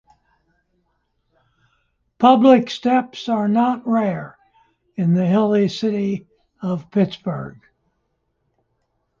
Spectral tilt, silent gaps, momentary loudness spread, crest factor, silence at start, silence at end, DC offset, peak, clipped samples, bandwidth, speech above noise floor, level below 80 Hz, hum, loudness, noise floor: -7.5 dB/octave; none; 17 LU; 18 dB; 2.2 s; 1.7 s; under 0.1%; -2 dBFS; under 0.1%; 7.4 kHz; 53 dB; -62 dBFS; none; -18 LUFS; -71 dBFS